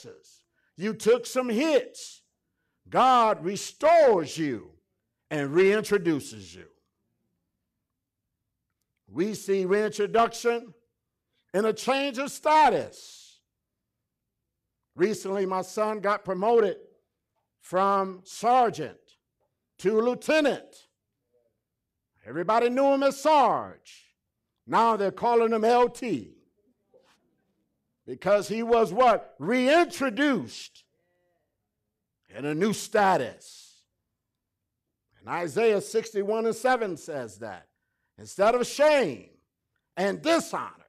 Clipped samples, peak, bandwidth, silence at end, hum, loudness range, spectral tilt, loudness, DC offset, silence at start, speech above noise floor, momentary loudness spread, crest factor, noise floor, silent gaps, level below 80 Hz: under 0.1%; -12 dBFS; 15 kHz; 0.2 s; none; 6 LU; -4.5 dB/octave; -25 LUFS; under 0.1%; 0.05 s; 59 dB; 15 LU; 14 dB; -84 dBFS; none; -68 dBFS